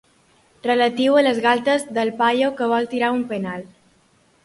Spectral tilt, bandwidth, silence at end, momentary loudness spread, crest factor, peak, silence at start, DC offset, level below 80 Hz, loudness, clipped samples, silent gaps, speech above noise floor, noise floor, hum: -4.5 dB/octave; 11.5 kHz; 0.8 s; 11 LU; 16 dB; -4 dBFS; 0.65 s; under 0.1%; -64 dBFS; -19 LUFS; under 0.1%; none; 39 dB; -59 dBFS; none